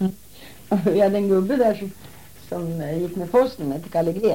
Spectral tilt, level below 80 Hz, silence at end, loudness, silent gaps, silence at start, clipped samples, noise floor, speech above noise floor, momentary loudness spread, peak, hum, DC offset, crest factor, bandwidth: -7.5 dB/octave; -54 dBFS; 0 s; -22 LUFS; none; 0 s; under 0.1%; -45 dBFS; 24 dB; 12 LU; -6 dBFS; none; 0.5%; 16 dB; 17 kHz